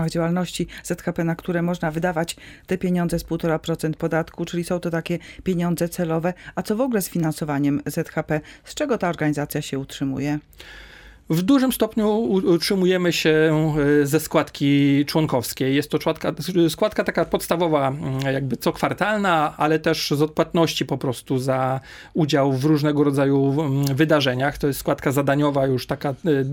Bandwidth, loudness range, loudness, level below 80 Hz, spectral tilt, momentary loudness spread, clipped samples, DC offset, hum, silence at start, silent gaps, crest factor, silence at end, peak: 17.5 kHz; 5 LU; -22 LUFS; -48 dBFS; -6 dB/octave; 8 LU; under 0.1%; under 0.1%; none; 0 s; none; 18 dB; 0 s; -4 dBFS